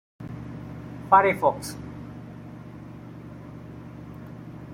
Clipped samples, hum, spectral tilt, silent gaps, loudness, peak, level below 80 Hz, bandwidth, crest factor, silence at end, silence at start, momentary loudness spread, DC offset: under 0.1%; none; -6 dB/octave; none; -22 LUFS; -4 dBFS; -54 dBFS; 16.5 kHz; 24 dB; 0 s; 0.2 s; 23 LU; under 0.1%